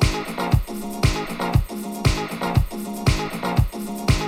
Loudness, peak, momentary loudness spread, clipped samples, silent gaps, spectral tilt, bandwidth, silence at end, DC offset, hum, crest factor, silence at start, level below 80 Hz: -23 LUFS; -4 dBFS; 4 LU; under 0.1%; none; -5.5 dB/octave; 17 kHz; 0 s; under 0.1%; none; 18 dB; 0 s; -28 dBFS